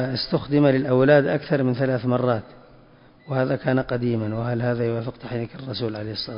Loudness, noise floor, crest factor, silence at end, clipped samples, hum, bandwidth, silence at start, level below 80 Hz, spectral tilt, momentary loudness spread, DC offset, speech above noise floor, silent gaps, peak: -23 LUFS; -51 dBFS; 18 dB; 0 s; under 0.1%; none; 5.4 kHz; 0 s; -52 dBFS; -11.5 dB/octave; 12 LU; under 0.1%; 29 dB; none; -4 dBFS